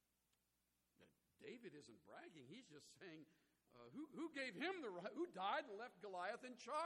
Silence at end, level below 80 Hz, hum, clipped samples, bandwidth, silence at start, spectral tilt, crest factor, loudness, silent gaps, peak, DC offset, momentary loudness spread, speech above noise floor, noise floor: 0 s; under -90 dBFS; none; under 0.1%; 16 kHz; 1 s; -4 dB/octave; 20 dB; -51 LUFS; none; -32 dBFS; under 0.1%; 17 LU; 36 dB; -88 dBFS